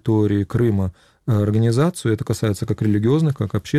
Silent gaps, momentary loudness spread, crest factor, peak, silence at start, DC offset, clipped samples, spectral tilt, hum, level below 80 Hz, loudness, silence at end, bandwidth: none; 6 LU; 12 dB; -8 dBFS; 0.05 s; 0.2%; under 0.1%; -7.5 dB/octave; none; -46 dBFS; -20 LUFS; 0 s; 14 kHz